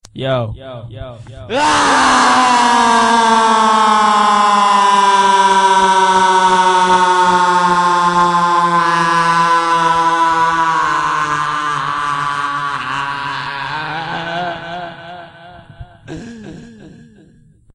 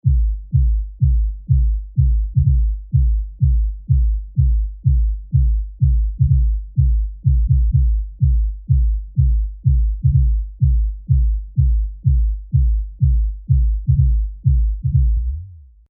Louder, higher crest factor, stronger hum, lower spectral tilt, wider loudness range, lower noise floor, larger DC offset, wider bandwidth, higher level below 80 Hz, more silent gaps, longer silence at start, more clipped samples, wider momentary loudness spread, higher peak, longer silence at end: first, -12 LUFS vs -19 LUFS; about the same, 12 dB vs 12 dB; neither; second, -3 dB/octave vs -29.5 dB/octave; first, 13 LU vs 1 LU; first, -47 dBFS vs -37 dBFS; neither; first, 11 kHz vs 0.3 kHz; second, -46 dBFS vs -18 dBFS; neither; about the same, 0.15 s vs 0.05 s; neither; first, 18 LU vs 4 LU; about the same, -2 dBFS vs -4 dBFS; first, 0.85 s vs 0.3 s